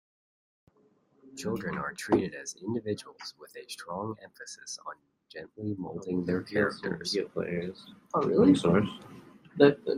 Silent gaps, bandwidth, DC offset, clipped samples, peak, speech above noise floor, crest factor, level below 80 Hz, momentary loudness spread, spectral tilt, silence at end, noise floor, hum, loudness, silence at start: none; 13 kHz; under 0.1%; under 0.1%; -6 dBFS; 37 dB; 24 dB; -64 dBFS; 22 LU; -5.5 dB/octave; 0 s; -67 dBFS; none; -30 LUFS; 1.25 s